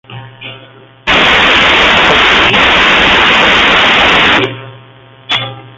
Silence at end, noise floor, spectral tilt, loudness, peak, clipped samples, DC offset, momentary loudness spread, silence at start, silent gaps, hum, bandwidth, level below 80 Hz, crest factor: 0.1 s; -37 dBFS; -3 dB/octave; -6 LUFS; 0 dBFS; under 0.1%; under 0.1%; 17 LU; 0.1 s; none; none; 12 kHz; -32 dBFS; 10 dB